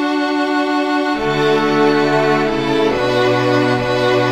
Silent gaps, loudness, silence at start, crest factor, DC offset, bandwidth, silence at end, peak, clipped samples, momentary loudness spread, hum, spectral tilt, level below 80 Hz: none; -15 LUFS; 0 s; 12 dB; under 0.1%; 14 kHz; 0 s; -2 dBFS; under 0.1%; 3 LU; none; -6 dB/octave; -46 dBFS